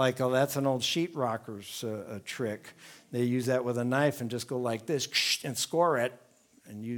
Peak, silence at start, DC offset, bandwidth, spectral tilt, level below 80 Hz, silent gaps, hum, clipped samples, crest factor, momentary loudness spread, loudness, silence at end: -12 dBFS; 0 s; under 0.1%; 19.5 kHz; -4 dB/octave; -76 dBFS; none; none; under 0.1%; 20 dB; 12 LU; -30 LUFS; 0 s